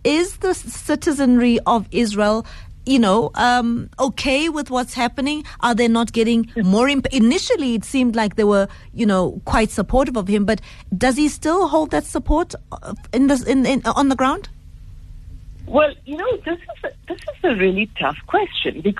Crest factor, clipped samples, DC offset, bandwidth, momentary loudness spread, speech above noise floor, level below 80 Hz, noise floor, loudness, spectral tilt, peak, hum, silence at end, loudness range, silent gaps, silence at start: 16 dB; under 0.1%; under 0.1%; 13 kHz; 9 LU; 20 dB; -36 dBFS; -38 dBFS; -19 LUFS; -5 dB/octave; -2 dBFS; none; 0 s; 4 LU; none; 0.05 s